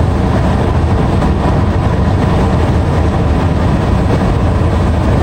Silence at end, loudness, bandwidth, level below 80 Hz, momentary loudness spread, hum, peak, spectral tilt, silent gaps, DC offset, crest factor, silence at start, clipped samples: 0 s; -13 LUFS; 9.6 kHz; -16 dBFS; 1 LU; none; -2 dBFS; -8 dB/octave; none; under 0.1%; 8 dB; 0 s; under 0.1%